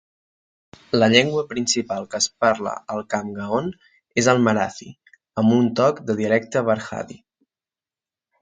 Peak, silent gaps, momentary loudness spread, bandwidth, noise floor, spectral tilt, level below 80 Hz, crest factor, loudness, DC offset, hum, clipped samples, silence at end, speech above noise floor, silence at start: 0 dBFS; none; 12 LU; 9.6 kHz; under -90 dBFS; -4 dB/octave; -60 dBFS; 22 dB; -21 LUFS; under 0.1%; none; under 0.1%; 1.25 s; over 70 dB; 0.95 s